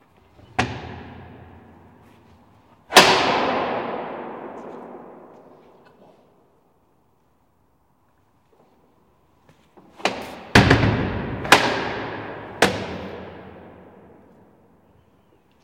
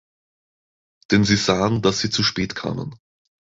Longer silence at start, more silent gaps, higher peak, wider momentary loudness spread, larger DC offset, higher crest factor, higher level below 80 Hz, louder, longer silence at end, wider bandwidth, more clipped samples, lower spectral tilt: second, 0.6 s vs 1.1 s; neither; about the same, 0 dBFS vs -2 dBFS; first, 26 LU vs 11 LU; neither; about the same, 24 dB vs 20 dB; about the same, -44 dBFS vs -48 dBFS; about the same, -20 LUFS vs -20 LUFS; first, 1.9 s vs 0.65 s; first, 16.5 kHz vs 8 kHz; neither; about the same, -4 dB/octave vs -4.5 dB/octave